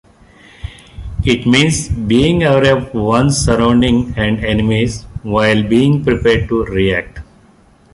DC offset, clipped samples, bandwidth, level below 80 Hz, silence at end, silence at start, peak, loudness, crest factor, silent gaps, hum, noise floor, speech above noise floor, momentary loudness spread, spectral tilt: under 0.1%; under 0.1%; 11.5 kHz; -30 dBFS; 0.7 s; 0.65 s; 0 dBFS; -13 LUFS; 14 dB; none; none; -47 dBFS; 34 dB; 16 LU; -5.5 dB/octave